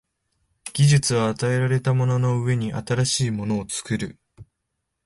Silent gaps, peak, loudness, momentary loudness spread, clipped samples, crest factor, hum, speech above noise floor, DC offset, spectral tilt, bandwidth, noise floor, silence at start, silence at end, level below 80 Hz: none; -8 dBFS; -22 LUFS; 10 LU; under 0.1%; 16 dB; none; 57 dB; under 0.1%; -5 dB/octave; 11.5 kHz; -78 dBFS; 0.65 s; 0.65 s; -52 dBFS